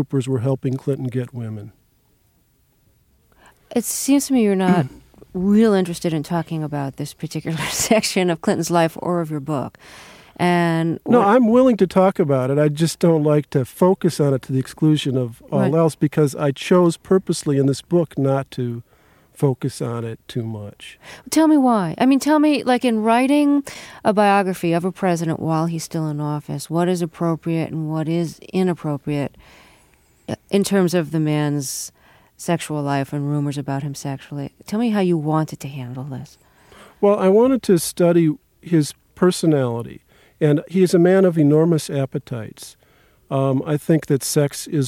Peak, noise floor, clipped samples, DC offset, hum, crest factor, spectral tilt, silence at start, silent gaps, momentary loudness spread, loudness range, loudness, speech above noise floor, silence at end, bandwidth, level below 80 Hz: -2 dBFS; -60 dBFS; under 0.1%; under 0.1%; none; 18 dB; -6 dB/octave; 0 s; none; 14 LU; 7 LU; -19 LUFS; 42 dB; 0 s; 16.5 kHz; -56 dBFS